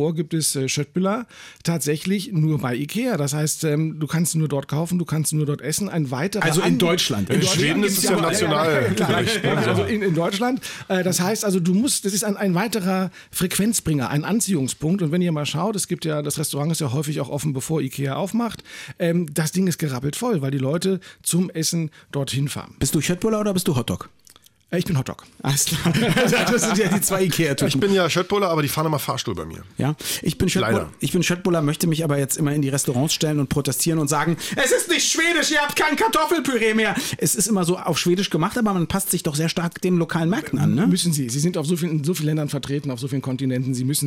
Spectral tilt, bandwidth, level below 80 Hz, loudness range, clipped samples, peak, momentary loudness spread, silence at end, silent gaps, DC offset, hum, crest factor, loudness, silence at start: -4.5 dB/octave; 17 kHz; -52 dBFS; 5 LU; under 0.1%; -8 dBFS; 7 LU; 0 s; none; under 0.1%; none; 12 dB; -21 LUFS; 0 s